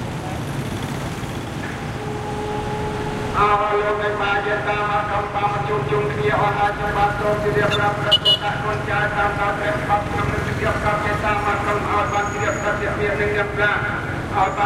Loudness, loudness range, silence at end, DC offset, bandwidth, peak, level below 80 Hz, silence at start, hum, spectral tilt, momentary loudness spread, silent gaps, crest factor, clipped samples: -20 LUFS; 4 LU; 0 s; under 0.1%; 16 kHz; -4 dBFS; -38 dBFS; 0 s; none; -5 dB/octave; 9 LU; none; 16 dB; under 0.1%